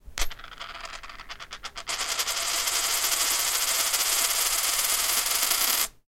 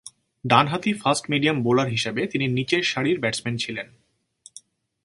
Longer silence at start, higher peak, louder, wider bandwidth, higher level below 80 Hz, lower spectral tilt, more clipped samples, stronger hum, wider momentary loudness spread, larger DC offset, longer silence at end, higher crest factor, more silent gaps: about the same, 0.05 s vs 0.05 s; second, -4 dBFS vs 0 dBFS; about the same, -23 LUFS vs -22 LUFS; first, 17 kHz vs 11.5 kHz; first, -44 dBFS vs -62 dBFS; second, 2 dB/octave vs -4.5 dB/octave; neither; neither; first, 17 LU vs 9 LU; neither; second, 0.2 s vs 1.2 s; about the same, 24 dB vs 24 dB; neither